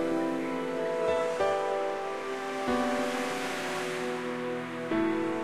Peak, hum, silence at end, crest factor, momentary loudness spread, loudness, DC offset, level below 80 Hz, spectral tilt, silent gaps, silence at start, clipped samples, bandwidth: -16 dBFS; none; 0 s; 14 dB; 6 LU; -31 LUFS; 0.2%; -64 dBFS; -4.5 dB/octave; none; 0 s; under 0.1%; 15.5 kHz